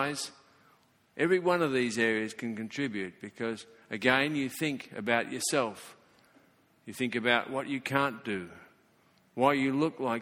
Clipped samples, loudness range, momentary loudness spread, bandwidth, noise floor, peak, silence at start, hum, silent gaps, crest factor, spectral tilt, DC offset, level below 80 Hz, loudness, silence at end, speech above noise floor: under 0.1%; 3 LU; 14 LU; 18 kHz; -66 dBFS; -8 dBFS; 0 s; none; none; 24 dB; -4 dB/octave; under 0.1%; -72 dBFS; -30 LUFS; 0 s; 35 dB